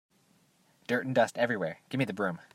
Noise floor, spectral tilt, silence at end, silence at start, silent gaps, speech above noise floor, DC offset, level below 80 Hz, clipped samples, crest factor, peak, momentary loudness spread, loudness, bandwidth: -67 dBFS; -6 dB/octave; 0.1 s; 0.9 s; none; 37 dB; under 0.1%; -78 dBFS; under 0.1%; 20 dB; -12 dBFS; 7 LU; -31 LUFS; 16 kHz